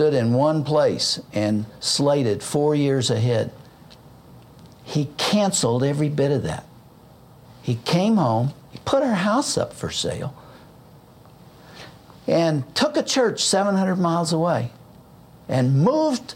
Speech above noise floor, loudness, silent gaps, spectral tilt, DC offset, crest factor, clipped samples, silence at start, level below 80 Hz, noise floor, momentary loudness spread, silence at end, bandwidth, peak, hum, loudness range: 28 dB; -21 LUFS; none; -5 dB/octave; under 0.1%; 16 dB; under 0.1%; 0 s; -56 dBFS; -48 dBFS; 11 LU; 0 s; 16.5 kHz; -6 dBFS; none; 4 LU